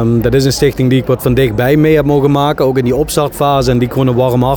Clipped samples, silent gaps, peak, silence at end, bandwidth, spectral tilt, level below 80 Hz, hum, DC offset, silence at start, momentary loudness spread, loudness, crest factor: under 0.1%; none; 0 dBFS; 0 s; 17.5 kHz; -6.5 dB/octave; -30 dBFS; none; 0.2%; 0 s; 3 LU; -11 LUFS; 10 dB